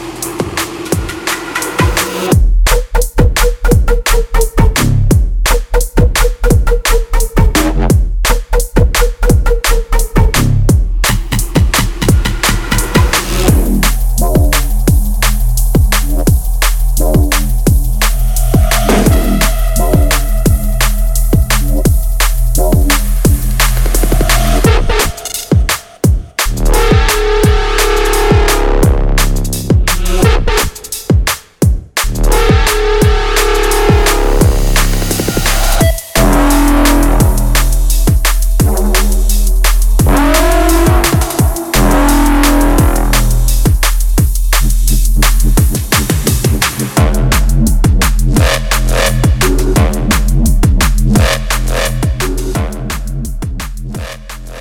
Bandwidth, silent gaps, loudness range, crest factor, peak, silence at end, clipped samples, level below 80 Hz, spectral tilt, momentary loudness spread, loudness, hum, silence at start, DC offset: 17.5 kHz; none; 2 LU; 10 dB; 0 dBFS; 0 s; under 0.1%; -12 dBFS; -4.5 dB/octave; 5 LU; -12 LUFS; none; 0 s; under 0.1%